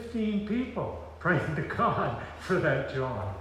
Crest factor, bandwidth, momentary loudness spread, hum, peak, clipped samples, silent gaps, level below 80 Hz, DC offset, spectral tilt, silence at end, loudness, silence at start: 16 dB; 12.5 kHz; 7 LU; none; -14 dBFS; under 0.1%; none; -52 dBFS; under 0.1%; -7.5 dB/octave; 0 s; -30 LUFS; 0 s